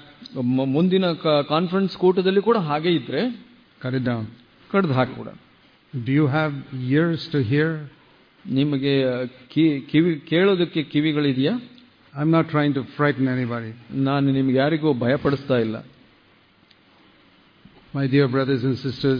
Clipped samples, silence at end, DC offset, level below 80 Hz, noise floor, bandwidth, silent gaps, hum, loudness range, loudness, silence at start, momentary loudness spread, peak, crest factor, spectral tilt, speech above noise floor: under 0.1%; 0 s; under 0.1%; -60 dBFS; -56 dBFS; 5.2 kHz; none; none; 5 LU; -22 LUFS; 0.2 s; 11 LU; -6 dBFS; 16 dB; -9 dB/octave; 35 dB